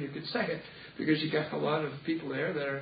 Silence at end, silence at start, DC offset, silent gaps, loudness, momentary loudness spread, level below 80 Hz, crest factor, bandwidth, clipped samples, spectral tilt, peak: 0 s; 0 s; under 0.1%; none; -33 LUFS; 6 LU; -68 dBFS; 18 dB; 5 kHz; under 0.1%; -9.5 dB/octave; -16 dBFS